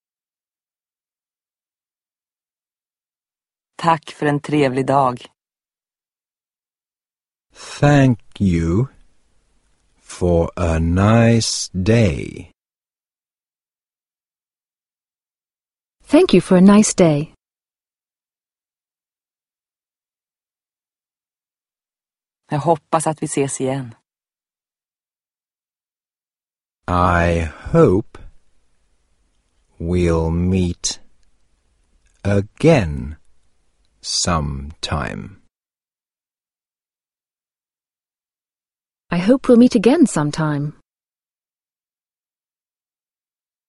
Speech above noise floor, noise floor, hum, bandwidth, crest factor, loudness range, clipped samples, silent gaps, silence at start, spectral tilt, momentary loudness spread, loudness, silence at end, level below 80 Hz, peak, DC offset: over 74 dB; under -90 dBFS; none; 11.5 kHz; 20 dB; 10 LU; under 0.1%; none; 3.8 s; -6 dB/octave; 15 LU; -17 LUFS; 3 s; -40 dBFS; 0 dBFS; under 0.1%